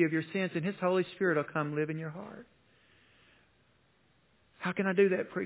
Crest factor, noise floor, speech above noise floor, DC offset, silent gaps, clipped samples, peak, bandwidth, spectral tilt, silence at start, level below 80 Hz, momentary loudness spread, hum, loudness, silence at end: 20 dB; -69 dBFS; 38 dB; under 0.1%; none; under 0.1%; -14 dBFS; 4 kHz; -5.5 dB/octave; 0 s; -78 dBFS; 14 LU; none; -32 LUFS; 0 s